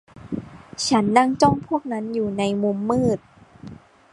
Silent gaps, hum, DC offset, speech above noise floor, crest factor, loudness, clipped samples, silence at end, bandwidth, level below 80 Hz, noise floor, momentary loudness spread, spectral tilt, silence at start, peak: none; none; under 0.1%; 22 dB; 22 dB; -21 LUFS; under 0.1%; 0.4 s; 11.5 kHz; -50 dBFS; -42 dBFS; 19 LU; -5.5 dB/octave; 0.15 s; -2 dBFS